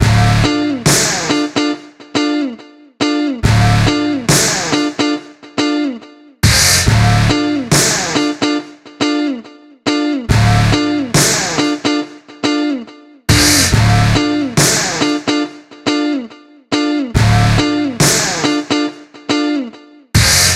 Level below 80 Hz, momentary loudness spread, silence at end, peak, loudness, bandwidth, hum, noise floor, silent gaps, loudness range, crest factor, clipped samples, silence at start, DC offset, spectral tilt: -28 dBFS; 11 LU; 0 s; 0 dBFS; -13 LUFS; 16 kHz; none; -35 dBFS; none; 3 LU; 14 dB; under 0.1%; 0 s; under 0.1%; -4 dB/octave